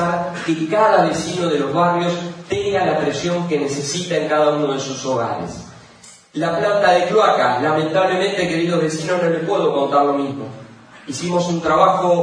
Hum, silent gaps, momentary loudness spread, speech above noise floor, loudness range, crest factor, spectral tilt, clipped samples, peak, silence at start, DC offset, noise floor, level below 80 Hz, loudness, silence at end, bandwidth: none; none; 10 LU; 27 dB; 3 LU; 18 dB; -5 dB/octave; under 0.1%; 0 dBFS; 0 s; under 0.1%; -44 dBFS; -54 dBFS; -18 LUFS; 0 s; 10.5 kHz